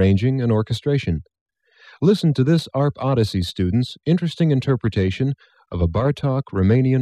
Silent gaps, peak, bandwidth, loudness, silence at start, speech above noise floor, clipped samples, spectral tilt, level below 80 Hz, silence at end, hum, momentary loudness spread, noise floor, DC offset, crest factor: 1.41-1.46 s; -4 dBFS; 12 kHz; -20 LUFS; 0 s; 32 dB; under 0.1%; -8 dB/octave; -42 dBFS; 0 s; none; 7 LU; -50 dBFS; under 0.1%; 16 dB